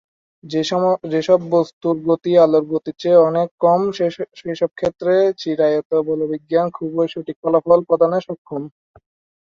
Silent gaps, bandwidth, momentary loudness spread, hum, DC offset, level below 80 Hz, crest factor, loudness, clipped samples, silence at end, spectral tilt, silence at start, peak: 1.73-1.81 s, 3.51-3.58 s, 5.85-5.90 s, 7.36-7.43 s, 8.38-8.45 s; 7.4 kHz; 11 LU; none; under 0.1%; -60 dBFS; 16 dB; -18 LUFS; under 0.1%; 0.75 s; -7 dB/octave; 0.45 s; -2 dBFS